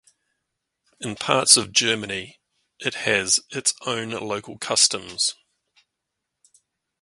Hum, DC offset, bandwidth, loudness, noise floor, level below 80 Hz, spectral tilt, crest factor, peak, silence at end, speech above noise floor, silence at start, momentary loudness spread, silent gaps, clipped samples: none; under 0.1%; 12 kHz; -21 LUFS; -82 dBFS; -62 dBFS; -1 dB/octave; 26 dB; 0 dBFS; 1.7 s; 59 dB; 1 s; 16 LU; none; under 0.1%